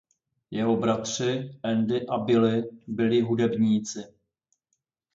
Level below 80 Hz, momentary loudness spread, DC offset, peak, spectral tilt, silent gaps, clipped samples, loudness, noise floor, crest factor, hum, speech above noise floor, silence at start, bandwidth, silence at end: -66 dBFS; 10 LU; under 0.1%; -10 dBFS; -5.5 dB/octave; none; under 0.1%; -25 LUFS; -79 dBFS; 16 dB; none; 54 dB; 0.5 s; 7.8 kHz; 1.1 s